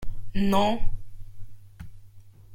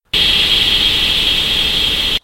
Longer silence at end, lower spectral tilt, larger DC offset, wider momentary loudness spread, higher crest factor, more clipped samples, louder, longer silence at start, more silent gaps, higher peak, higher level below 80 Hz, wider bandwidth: about the same, 0 s vs 0.05 s; first, -6.5 dB/octave vs -1.5 dB/octave; neither; first, 26 LU vs 3 LU; about the same, 16 dB vs 14 dB; neither; second, -27 LUFS vs -11 LUFS; second, 0 s vs 0.15 s; neither; second, -8 dBFS vs -2 dBFS; about the same, -34 dBFS vs -30 dBFS; second, 13 kHz vs 16.5 kHz